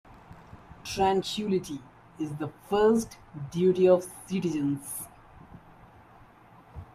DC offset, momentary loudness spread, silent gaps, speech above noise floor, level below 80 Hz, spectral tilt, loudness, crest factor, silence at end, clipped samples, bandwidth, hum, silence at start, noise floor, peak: under 0.1%; 19 LU; none; 27 dB; -58 dBFS; -5.5 dB/octave; -28 LUFS; 20 dB; 0.1 s; under 0.1%; 15.5 kHz; none; 0.3 s; -54 dBFS; -10 dBFS